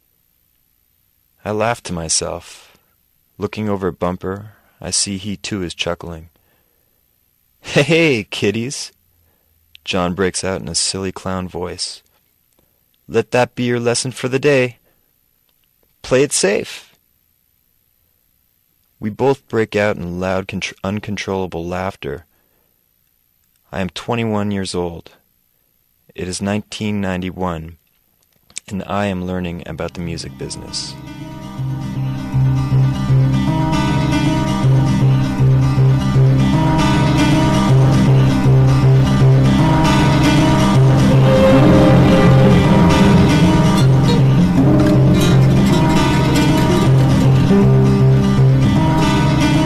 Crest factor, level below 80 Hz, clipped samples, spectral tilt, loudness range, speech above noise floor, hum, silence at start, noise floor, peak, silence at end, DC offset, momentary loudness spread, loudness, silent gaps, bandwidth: 14 dB; -32 dBFS; under 0.1%; -6 dB/octave; 13 LU; 41 dB; none; 1.45 s; -61 dBFS; -2 dBFS; 0 s; under 0.1%; 15 LU; -15 LUFS; none; 13 kHz